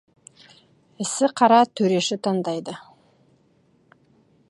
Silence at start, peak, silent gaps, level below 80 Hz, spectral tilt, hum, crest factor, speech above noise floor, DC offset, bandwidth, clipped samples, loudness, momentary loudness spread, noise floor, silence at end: 1 s; -2 dBFS; none; -74 dBFS; -4.5 dB/octave; none; 22 dB; 41 dB; under 0.1%; 11.5 kHz; under 0.1%; -21 LUFS; 15 LU; -61 dBFS; 1.7 s